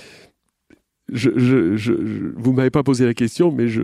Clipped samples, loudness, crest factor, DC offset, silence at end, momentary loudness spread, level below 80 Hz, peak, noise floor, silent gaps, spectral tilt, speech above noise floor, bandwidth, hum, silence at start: under 0.1%; -18 LUFS; 16 dB; under 0.1%; 0 s; 6 LU; -52 dBFS; -4 dBFS; -56 dBFS; none; -7 dB/octave; 39 dB; 12.5 kHz; none; 1.1 s